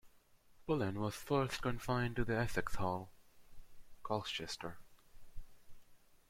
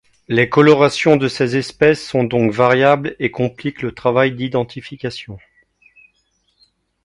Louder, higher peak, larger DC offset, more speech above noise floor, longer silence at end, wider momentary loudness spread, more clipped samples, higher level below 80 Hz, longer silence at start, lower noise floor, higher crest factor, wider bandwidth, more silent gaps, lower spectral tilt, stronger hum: second, -39 LUFS vs -16 LUFS; second, -20 dBFS vs 0 dBFS; neither; second, 28 dB vs 48 dB; second, 0.35 s vs 1.65 s; about the same, 14 LU vs 15 LU; neither; about the same, -54 dBFS vs -52 dBFS; second, 0.05 s vs 0.3 s; about the same, -66 dBFS vs -64 dBFS; about the same, 20 dB vs 16 dB; first, 16.5 kHz vs 11.5 kHz; neither; about the same, -5.5 dB/octave vs -6 dB/octave; neither